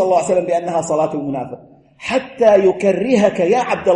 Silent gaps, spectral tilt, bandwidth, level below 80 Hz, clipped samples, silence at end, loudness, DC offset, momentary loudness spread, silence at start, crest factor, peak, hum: none; -5.5 dB/octave; 11 kHz; -56 dBFS; under 0.1%; 0 s; -16 LUFS; under 0.1%; 13 LU; 0 s; 14 dB; -2 dBFS; none